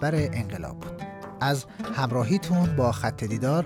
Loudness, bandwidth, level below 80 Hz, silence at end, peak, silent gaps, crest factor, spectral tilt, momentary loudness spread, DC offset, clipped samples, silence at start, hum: -27 LUFS; 16 kHz; -50 dBFS; 0 s; -12 dBFS; none; 14 dB; -6.5 dB/octave; 14 LU; under 0.1%; under 0.1%; 0 s; none